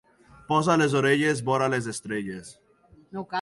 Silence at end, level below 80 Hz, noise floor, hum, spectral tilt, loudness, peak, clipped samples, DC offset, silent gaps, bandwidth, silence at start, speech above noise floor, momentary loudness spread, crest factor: 0 s; -62 dBFS; -57 dBFS; none; -5 dB/octave; -24 LUFS; -8 dBFS; under 0.1%; under 0.1%; none; 11.5 kHz; 0.5 s; 32 dB; 16 LU; 18 dB